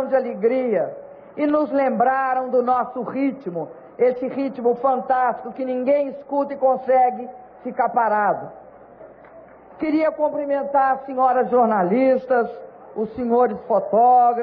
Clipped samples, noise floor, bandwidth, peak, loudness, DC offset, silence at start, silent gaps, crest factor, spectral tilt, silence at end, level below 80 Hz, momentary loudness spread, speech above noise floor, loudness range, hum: under 0.1%; -44 dBFS; 5 kHz; -8 dBFS; -20 LUFS; under 0.1%; 0 s; none; 14 dB; -10 dB/octave; 0 s; -64 dBFS; 11 LU; 25 dB; 3 LU; none